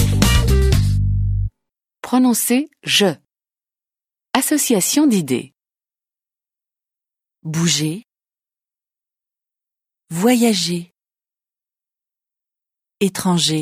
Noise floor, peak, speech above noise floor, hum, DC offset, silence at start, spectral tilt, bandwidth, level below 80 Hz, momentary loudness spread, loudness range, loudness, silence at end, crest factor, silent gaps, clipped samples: under -90 dBFS; 0 dBFS; over 73 dB; none; under 0.1%; 0 s; -4.5 dB/octave; 16.5 kHz; -28 dBFS; 12 LU; 8 LU; -17 LUFS; 0 s; 20 dB; none; under 0.1%